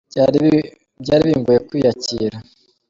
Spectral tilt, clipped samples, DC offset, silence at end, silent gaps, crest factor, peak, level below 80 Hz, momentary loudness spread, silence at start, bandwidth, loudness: -6.5 dB/octave; under 0.1%; under 0.1%; 0.45 s; none; 14 dB; -2 dBFS; -48 dBFS; 10 LU; 0.15 s; 7.6 kHz; -17 LUFS